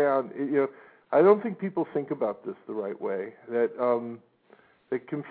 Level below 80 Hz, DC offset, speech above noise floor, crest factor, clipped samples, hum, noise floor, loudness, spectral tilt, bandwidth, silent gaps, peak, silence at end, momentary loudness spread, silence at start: -80 dBFS; under 0.1%; 33 dB; 20 dB; under 0.1%; none; -60 dBFS; -28 LUFS; -11 dB/octave; 4.5 kHz; none; -8 dBFS; 0 s; 13 LU; 0 s